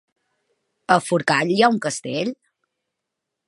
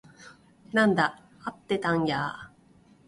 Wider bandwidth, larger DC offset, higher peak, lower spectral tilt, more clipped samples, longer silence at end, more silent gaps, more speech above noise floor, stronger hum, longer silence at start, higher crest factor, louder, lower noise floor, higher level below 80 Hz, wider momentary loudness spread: about the same, 11.5 kHz vs 11.5 kHz; neither; first, -2 dBFS vs -10 dBFS; second, -4.5 dB/octave vs -6 dB/octave; neither; first, 1.15 s vs 0.6 s; neither; first, 62 dB vs 32 dB; neither; first, 0.9 s vs 0.2 s; about the same, 22 dB vs 20 dB; first, -20 LUFS vs -26 LUFS; first, -82 dBFS vs -58 dBFS; second, -72 dBFS vs -62 dBFS; second, 10 LU vs 16 LU